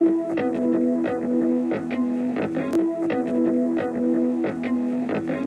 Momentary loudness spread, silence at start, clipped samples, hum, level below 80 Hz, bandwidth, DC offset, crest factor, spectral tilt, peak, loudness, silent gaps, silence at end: 4 LU; 0 s; under 0.1%; none; -64 dBFS; 9.4 kHz; under 0.1%; 12 dB; -8 dB/octave; -10 dBFS; -23 LUFS; none; 0 s